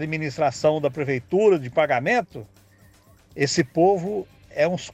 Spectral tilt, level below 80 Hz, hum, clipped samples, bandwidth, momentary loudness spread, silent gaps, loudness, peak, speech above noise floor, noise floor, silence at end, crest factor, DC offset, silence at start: -5.5 dB/octave; -58 dBFS; none; under 0.1%; 14 kHz; 13 LU; none; -22 LUFS; -8 dBFS; 32 dB; -54 dBFS; 0 s; 16 dB; under 0.1%; 0 s